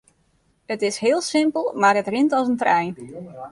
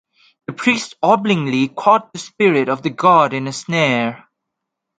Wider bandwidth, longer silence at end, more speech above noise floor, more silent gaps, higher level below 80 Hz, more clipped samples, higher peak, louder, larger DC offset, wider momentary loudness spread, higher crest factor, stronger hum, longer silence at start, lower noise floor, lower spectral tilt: first, 11.5 kHz vs 9.4 kHz; second, 0 s vs 0.8 s; second, 43 dB vs 63 dB; neither; about the same, -66 dBFS vs -64 dBFS; neither; second, -4 dBFS vs 0 dBFS; second, -20 LUFS vs -16 LUFS; neither; first, 14 LU vs 11 LU; about the same, 18 dB vs 18 dB; neither; first, 0.7 s vs 0.5 s; second, -64 dBFS vs -79 dBFS; about the same, -4 dB/octave vs -5 dB/octave